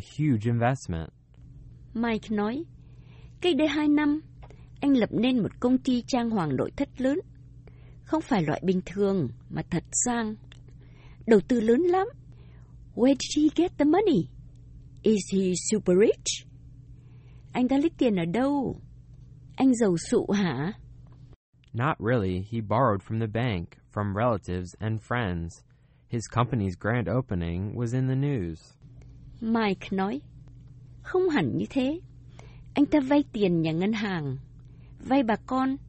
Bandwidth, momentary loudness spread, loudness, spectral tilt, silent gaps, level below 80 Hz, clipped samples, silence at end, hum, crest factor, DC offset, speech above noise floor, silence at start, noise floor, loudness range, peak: 8.4 kHz; 12 LU; -27 LUFS; -6 dB/octave; 21.36-21.53 s; -52 dBFS; under 0.1%; 0 s; none; 20 dB; under 0.1%; 23 dB; 0 s; -49 dBFS; 5 LU; -8 dBFS